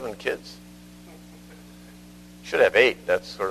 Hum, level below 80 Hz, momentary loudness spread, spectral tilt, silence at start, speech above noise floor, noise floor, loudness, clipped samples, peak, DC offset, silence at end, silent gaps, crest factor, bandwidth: 60 Hz at -50 dBFS; -56 dBFS; 25 LU; -3.5 dB/octave; 0 s; 24 dB; -46 dBFS; -22 LUFS; under 0.1%; -2 dBFS; under 0.1%; 0 s; none; 24 dB; 13.5 kHz